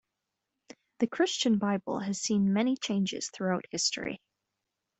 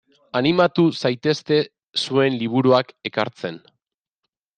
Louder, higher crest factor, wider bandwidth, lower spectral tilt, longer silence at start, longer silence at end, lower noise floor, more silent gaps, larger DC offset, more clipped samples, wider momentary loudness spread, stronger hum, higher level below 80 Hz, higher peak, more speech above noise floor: second, -30 LUFS vs -20 LUFS; about the same, 16 dB vs 18 dB; about the same, 8.4 kHz vs 9.2 kHz; second, -4 dB/octave vs -6 dB/octave; first, 1 s vs 0.35 s; second, 0.85 s vs 1 s; first, -86 dBFS vs -81 dBFS; second, none vs 1.83-1.93 s; neither; neither; second, 7 LU vs 10 LU; neither; second, -70 dBFS vs -64 dBFS; second, -14 dBFS vs -2 dBFS; second, 56 dB vs 61 dB